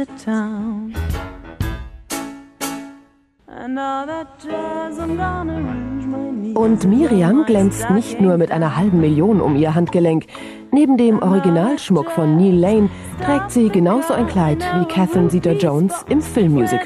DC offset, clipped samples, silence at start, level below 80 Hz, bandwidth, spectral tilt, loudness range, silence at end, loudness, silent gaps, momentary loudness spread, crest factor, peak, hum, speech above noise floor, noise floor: under 0.1%; under 0.1%; 0 s; -38 dBFS; 14.5 kHz; -7 dB/octave; 12 LU; 0 s; -17 LUFS; none; 13 LU; 14 dB; -2 dBFS; none; 36 dB; -52 dBFS